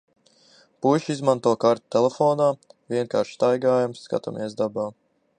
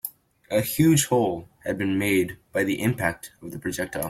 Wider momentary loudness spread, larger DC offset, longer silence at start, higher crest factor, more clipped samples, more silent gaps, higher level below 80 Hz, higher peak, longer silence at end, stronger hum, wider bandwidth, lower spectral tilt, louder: second, 9 LU vs 14 LU; neither; first, 0.8 s vs 0.05 s; about the same, 20 dB vs 18 dB; neither; neither; second, -72 dBFS vs -54 dBFS; about the same, -4 dBFS vs -6 dBFS; first, 0.5 s vs 0 s; neither; second, 10 kHz vs 16.5 kHz; first, -6.5 dB/octave vs -5 dB/octave; about the same, -23 LUFS vs -24 LUFS